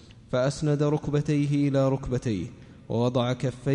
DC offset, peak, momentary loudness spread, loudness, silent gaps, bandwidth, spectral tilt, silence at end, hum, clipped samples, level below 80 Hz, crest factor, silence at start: under 0.1%; -12 dBFS; 7 LU; -26 LUFS; none; 10.5 kHz; -7.5 dB/octave; 0 s; none; under 0.1%; -50 dBFS; 14 dB; 0.1 s